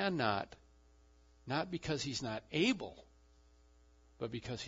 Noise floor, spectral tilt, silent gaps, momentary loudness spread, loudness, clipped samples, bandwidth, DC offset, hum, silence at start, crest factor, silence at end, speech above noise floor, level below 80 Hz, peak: -66 dBFS; -3.5 dB/octave; none; 14 LU; -38 LUFS; under 0.1%; 7.4 kHz; under 0.1%; none; 0 s; 20 dB; 0 s; 28 dB; -64 dBFS; -20 dBFS